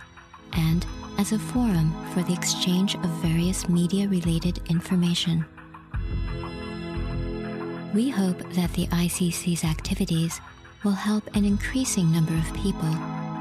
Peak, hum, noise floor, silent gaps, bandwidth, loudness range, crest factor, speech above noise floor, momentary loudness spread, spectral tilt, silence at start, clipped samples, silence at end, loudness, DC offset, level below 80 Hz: -8 dBFS; none; -47 dBFS; none; 15 kHz; 4 LU; 16 dB; 22 dB; 9 LU; -5.5 dB/octave; 0 s; under 0.1%; 0 s; -26 LUFS; under 0.1%; -38 dBFS